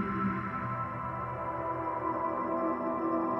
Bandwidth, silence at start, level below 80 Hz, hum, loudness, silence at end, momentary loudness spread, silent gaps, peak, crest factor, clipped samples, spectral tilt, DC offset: 5.6 kHz; 0 s; -60 dBFS; none; -33 LUFS; 0 s; 4 LU; none; -20 dBFS; 12 dB; under 0.1%; -9.5 dB/octave; under 0.1%